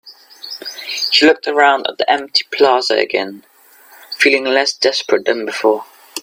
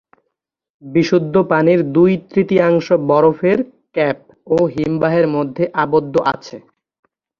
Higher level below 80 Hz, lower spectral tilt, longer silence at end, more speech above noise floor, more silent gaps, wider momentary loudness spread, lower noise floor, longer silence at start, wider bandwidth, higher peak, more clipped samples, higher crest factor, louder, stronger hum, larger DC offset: second, -64 dBFS vs -54 dBFS; second, -1.5 dB/octave vs -8 dB/octave; second, 0 s vs 0.8 s; second, 31 dB vs 61 dB; neither; first, 16 LU vs 6 LU; second, -45 dBFS vs -76 dBFS; second, 0.05 s vs 0.85 s; first, 16 kHz vs 7 kHz; about the same, 0 dBFS vs 0 dBFS; neither; about the same, 16 dB vs 16 dB; about the same, -14 LUFS vs -15 LUFS; neither; neither